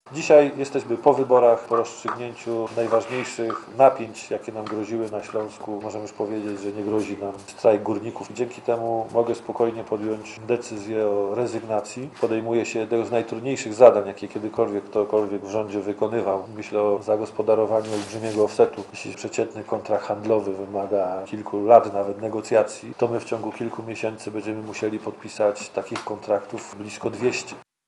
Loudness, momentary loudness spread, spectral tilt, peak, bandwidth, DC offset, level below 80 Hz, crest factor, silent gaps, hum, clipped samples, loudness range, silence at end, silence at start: -24 LUFS; 14 LU; -5.5 dB/octave; 0 dBFS; 11.5 kHz; under 0.1%; -70 dBFS; 24 dB; none; none; under 0.1%; 6 LU; 0.25 s; 0.05 s